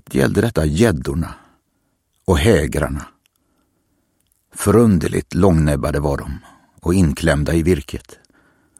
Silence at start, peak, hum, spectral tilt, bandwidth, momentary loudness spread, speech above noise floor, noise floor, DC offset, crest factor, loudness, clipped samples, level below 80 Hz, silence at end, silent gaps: 0.1 s; 0 dBFS; none; -6.5 dB/octave; 16 kHz; 15 LU; 51 dB; -67 dBFS; under 0.1%; 18 dB; -17 LUFS; under 0.1%; -30 dBFS; 0.8 s; none